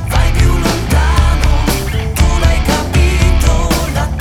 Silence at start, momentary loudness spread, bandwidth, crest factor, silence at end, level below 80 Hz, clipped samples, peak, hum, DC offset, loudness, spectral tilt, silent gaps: 0 s; 3 LU; 17 kHz; 10 dB; 0 s; -12 dBFS; under 0.1%; 0 dBFS; none; under 0.1%; -13 LUFS; -5 dB/octave; none